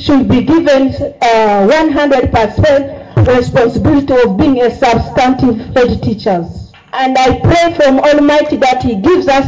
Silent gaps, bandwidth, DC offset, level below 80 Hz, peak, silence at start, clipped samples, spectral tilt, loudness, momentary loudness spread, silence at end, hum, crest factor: none; 7.8 kHz; under 0.1%; -28 dBFS; -2 dBFS; 0 s; under 0.1%; -6.5 dB/octave; -10 LUFS; 6 LU; 0 s; none; 8 dB